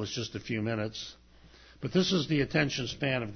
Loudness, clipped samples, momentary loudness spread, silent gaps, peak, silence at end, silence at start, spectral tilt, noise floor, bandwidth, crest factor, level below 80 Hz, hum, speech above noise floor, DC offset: -31 LUFS; under 0.1%; 12 LU; none; -12 dBFS; 0 s; 0 s; -5 dB/octave; -56 dBFS; 6.6 kHz; 20 dB; -56 dBFS; none; 25 dB; under 0.1%